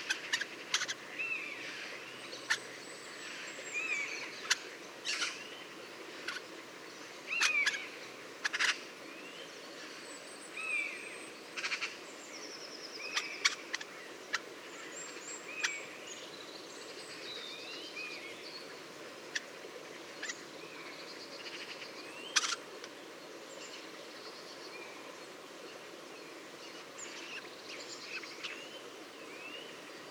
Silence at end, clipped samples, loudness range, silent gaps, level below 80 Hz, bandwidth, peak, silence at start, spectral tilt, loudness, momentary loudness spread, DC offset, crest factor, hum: 0 s; under 0.1%; 10 LU; none; under -90 dBFS; over 20 kHz; -10 dBFS; 0 s; 0 dB/octave; -39 LUFS; 15 LU; under 0.1%; 32 dB; none